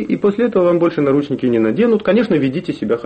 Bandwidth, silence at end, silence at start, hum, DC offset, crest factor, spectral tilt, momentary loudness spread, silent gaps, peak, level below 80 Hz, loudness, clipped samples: 8.4 kHz; 0 s; 0 s; none; under 0.1%; 10 dB; -8.5 dB/octave; 4 LU; none; -4 dBFS; -52 dBFS; -15 LUFS; under 0.1%